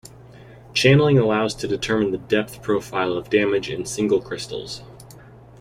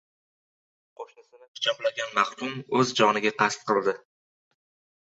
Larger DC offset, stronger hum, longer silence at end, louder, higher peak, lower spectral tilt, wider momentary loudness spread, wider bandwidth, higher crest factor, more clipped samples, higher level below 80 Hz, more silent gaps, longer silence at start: neither; neither; second, 0.4 s vs 1.05 s; first, -21 LUFS vs -25 LUFS; first, -2 dBFS vs -6 dBFS; first, -5.5 dB/octave vs -3.5 dB/octave; second, 14 LU vs 22 LU; first, 16 kHz vs 8.2 kHz; about the same, 18 dB vs 22 dB; neither; first, -50 dBFS vs -74 dBFS; second, none vs 1.48-1.55 s; second, 0.05 s vs 1 s